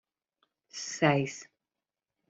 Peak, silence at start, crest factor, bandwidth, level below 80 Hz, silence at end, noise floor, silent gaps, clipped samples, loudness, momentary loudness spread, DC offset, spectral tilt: -10 dBFS; 0.75 s; 24 dB; 8 kHz; -74 dBFS; 0.85 s; under -90 dBFS; none; under 0.1%; -30 LUFS; 19 LU; under 0.1%; -5 dB/octave